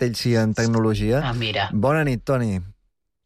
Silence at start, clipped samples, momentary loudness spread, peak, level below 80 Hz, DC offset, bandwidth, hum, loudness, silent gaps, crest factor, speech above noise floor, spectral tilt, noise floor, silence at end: 0 s; under 0.1%; 3 LU; -8 dBFS; -42 dBFS; under 0.1%; 14.5 kHz; none; -21 LUFS; none; 12 dB; 50 dB; -6 dB/octave; -70 dBFS; 0.55 s